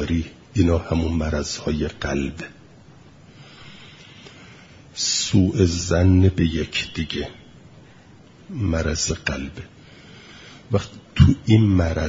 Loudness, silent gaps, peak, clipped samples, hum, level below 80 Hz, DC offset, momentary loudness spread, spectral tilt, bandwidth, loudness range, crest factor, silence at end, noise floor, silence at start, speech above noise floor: -21 LUFS; none; 0 dBFS; under 0.1%; none; -38 dBFS; under 0.1%; 26 LU; -5.5 dB/octave; 7.8 kHz; 9 LU; 22 dB; 0 s; -48 dBFS; 0 s; 28 dB